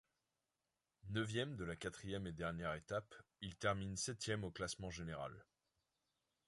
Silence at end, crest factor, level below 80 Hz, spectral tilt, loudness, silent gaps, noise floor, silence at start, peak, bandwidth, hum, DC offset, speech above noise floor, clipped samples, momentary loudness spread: 1.05 s; 22 dB; -64 dBFS; -4.5 dB/octave; -45 LUFS; none; under -90 dBFS; 1.05 s; -26 dBFS; 11.5 kHz; none; under 0.1%; over 45 dB; under 0.1%; 11 LU